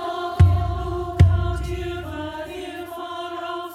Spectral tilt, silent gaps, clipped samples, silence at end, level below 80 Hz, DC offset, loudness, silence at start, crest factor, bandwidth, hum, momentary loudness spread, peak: -7.5 dB/octave; none; under 0.1%; 0 s; -32 dBFS; under 0.1%; -23 LUFS; 0 s; 20 dB; 12 kHz; none; 14 LU; -2 dBFS